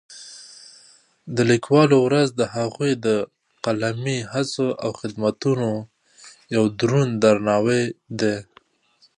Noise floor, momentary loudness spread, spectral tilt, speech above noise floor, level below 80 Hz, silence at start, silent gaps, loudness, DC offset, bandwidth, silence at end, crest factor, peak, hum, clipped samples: -60 dBFS; 14 LU; -6 dB/octave; 40 dB; -62 dBFS; 0.1 s; none; -21 LUFS; under 0.1%; 11 kHz; 0.75 s; 18 dB; -4 dBFS; none; under 0.1%